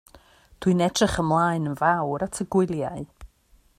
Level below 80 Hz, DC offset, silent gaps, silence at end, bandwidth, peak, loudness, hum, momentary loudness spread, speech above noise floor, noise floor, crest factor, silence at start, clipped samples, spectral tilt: -48 dBFS; under 0.1%; none; 0.55 s; 14.5 kHz; -6 dBFS; -24 LUFS; none; 9 LU; 36 dB; -60 dBFS; 18 dB; 0.15 s; under 0.1%; -5.5 dB/octave